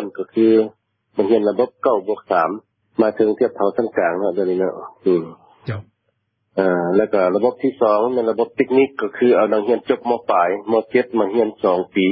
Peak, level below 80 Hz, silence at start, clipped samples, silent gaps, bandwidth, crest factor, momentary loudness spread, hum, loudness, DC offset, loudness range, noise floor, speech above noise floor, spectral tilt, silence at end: -2 dBFS; -62 dBFS; 0 s; under 0.1%; none; 5.6 kHz; 16 dB; 8 LU; none; -18 LUFS; under 0.1%; 4 LU; -70 dBFS; 53 dB; -11.5 dB/octave; 0 s